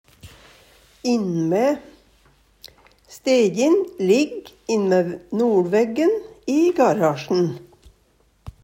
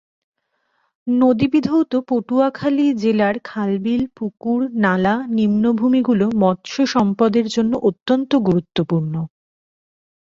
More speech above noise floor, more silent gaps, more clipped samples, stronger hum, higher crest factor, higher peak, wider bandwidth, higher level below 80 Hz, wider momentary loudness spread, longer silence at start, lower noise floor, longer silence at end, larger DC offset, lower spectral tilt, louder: second, 41 dB vs 51 dB; second, none vs 8.02-8.06 s; neither; neither; about the same, 16 dB vs 16 dB; second, -6 dBFS vs -2 dBFS; first, 16 kHz vs 7.6 kHz; about the same, -56 dBFS vs -54 dBFS; first, 9 LU vs 6 LU; second, 0.25 s vs 1.05 s; second, -60 dBFS vs -68 dBFS; second, 0.15 s vs 1 s; neither; about the same, -6 dB/octave vs -7 dB/octave; about the same, -20 LUFS vs -18 LUFS